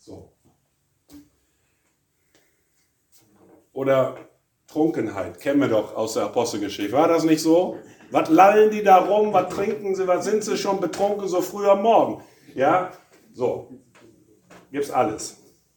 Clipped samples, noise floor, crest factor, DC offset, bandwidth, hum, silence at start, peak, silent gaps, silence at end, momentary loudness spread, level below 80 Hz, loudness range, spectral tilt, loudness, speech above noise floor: under 0.1%; -69 dBFS; 22 dB; under 0.1%; 19 kHz; none; 0.1 s; 0 dBFS; none; 0.45 s; 15 LU; -66 dBFS; 9 LU; -5 dB/octave; -21 LUFS; 49 dB